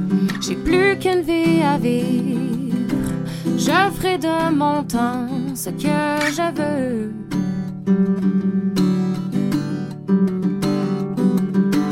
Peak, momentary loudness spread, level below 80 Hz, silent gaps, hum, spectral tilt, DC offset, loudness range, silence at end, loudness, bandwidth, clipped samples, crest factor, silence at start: -4 dBFS; 7 LU; -46 dBFS; none; none; -6 dB/octave; under 0.1%; 2 LU; 0 s; -20 LUFS; 16.5 kHz; under 0.1%; 14 dB; 0 s